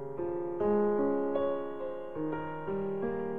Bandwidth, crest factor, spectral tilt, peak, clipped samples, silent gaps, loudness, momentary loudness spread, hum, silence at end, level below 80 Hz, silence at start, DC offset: 3.6 kHz; 16 dB; -10 dB/octave; -18 dBFS; under 0.1%; none; -33 LUFS; 9 LU; none; 0 s; -62 dBFS; 0 s; 0.5%